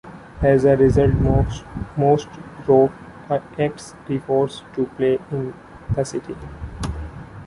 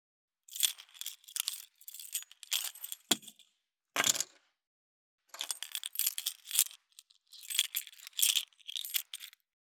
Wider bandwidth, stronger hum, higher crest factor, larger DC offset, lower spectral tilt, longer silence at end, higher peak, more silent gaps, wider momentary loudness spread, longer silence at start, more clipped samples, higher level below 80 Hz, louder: second, 11.5 kHz vs over 20 kHz; neither; second, 18 dB vs 36 dB; neither; first, -7.5 dB/octave vs 1.5 dB/octave; second, 0 s vs 0.4 s; about the same, -4 dBFS vs -2 dBFS; second, none vs 4.67-5.18 s; first, 19 LU vs 16 LU; second, 0.05 s vs 0.5 s; neither; first, -34 dBFS vs -88 dBFS; first, -20 LUFS vs -34 LUFS